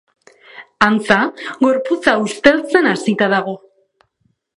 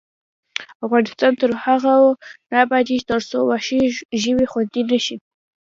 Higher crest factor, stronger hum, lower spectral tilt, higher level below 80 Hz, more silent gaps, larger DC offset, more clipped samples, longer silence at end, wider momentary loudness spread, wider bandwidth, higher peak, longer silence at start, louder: about the same, 16 dB vs 18 dB; neither; about the same, -5 dB/octave vs -4 dB/octave; about the same, -54 dBFS vs -56 dBFS; second, none vs 0.75-0.80 s, 4.05-4.09 s; neither; neither; first, 1 s vs 0.5 s; second, 6 LU vs 12 LU; first, 11.5 kHz vs 7.6 kHz; about the same, 0 dBFS vs 0 dBFS; about the same, 0.55 s vs 0.6 s; first, -15 LUFS vs -18 LUFS